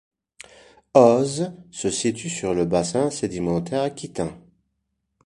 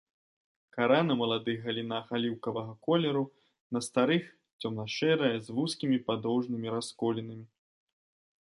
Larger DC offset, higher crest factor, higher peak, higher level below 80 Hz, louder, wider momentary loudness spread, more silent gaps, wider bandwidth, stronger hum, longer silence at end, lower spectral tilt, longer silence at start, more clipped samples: neither; about the same, 22 dB vs 20 dB; first, -2 dBFS vs -12 dBFS; first, -52 dBFS vs -74 dBFS; first, -22 LUFS vs -31 LUFS; first, 14 LU vs 11 LU; second, none vs 3.61-3.70 s, 4.53-4.59 s; about the same, 11.5 kHz vs 11.5 kHz; neither; second, 0.85 s vs 1.05 s; about the same, -5 dB/octave vs -5.5 dB/octave; first, 0.95 s vs 0.75 s; neither